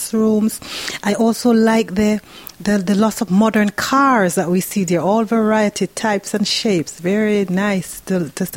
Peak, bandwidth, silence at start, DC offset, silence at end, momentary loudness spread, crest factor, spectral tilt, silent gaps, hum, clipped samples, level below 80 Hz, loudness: -2 dBFS; 17 kHz; 0 s; under 0.1%; 0 s; 8 LU; 14 dB; -5 dB/octave; none; none; under 0.1%; -50 dBFS; -17 LUFS